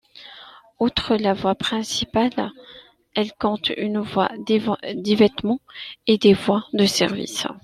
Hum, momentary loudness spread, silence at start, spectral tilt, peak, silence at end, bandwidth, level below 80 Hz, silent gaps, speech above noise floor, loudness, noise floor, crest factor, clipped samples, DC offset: none; 10 LU; 0.15 s; -4.5 dB/octave; -2 dBFS; 0.05 s; 14 kHz; -52 dBFS; none; 24 dB; -21 LUFS; -45 dBFS; 18 dB; under 0.1%; under 0.1%